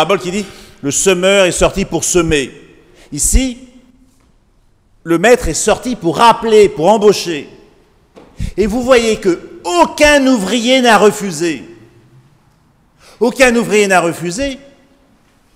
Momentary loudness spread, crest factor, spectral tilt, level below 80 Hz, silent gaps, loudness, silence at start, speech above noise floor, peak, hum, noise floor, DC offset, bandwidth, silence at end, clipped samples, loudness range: 13 LU; 14 dB; -3.5 dB/octave; -30 dBFS; none; -12 LUFS; 0 s; 40 dB; 0 dBFS; none; -52 dBFS; under 0.1%; 16.5 kHz; 1 s; 0.2%; 5 LU